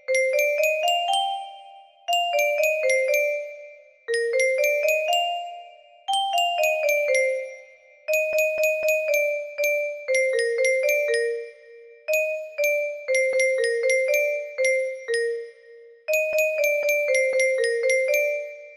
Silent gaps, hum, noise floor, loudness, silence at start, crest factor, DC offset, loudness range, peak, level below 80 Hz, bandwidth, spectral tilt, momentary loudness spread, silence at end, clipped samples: none; none; -50 dBFS; -22 LUFS; 0.1 s; 14 dB; under 0.1%; 2 LU; -10 dBFS; -76 dBFS; 15.5 kHz; 2 dB/octave; 11 LU; 0 s; under 0.1%